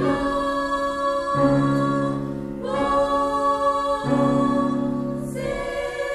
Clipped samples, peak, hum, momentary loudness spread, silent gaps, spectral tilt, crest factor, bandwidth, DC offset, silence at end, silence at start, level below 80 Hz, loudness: under 0.1%; -8 dBFS; none; 8 LU; none; -6.5 dB/octave; 14 dB; 12.5 kHz; under 0.1%; 0 s; 0 s; -44 dBFS; -22 LUFS